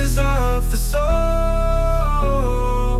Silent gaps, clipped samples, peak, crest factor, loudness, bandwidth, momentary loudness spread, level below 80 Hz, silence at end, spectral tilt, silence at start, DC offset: none; under 0.1%; -6 dBFS; 12 dB; -20 LUFS; 14.5 kHz; 2 LU; -18 dBFS; 0 s; -6 dB/octave; 0 s; under 0.1%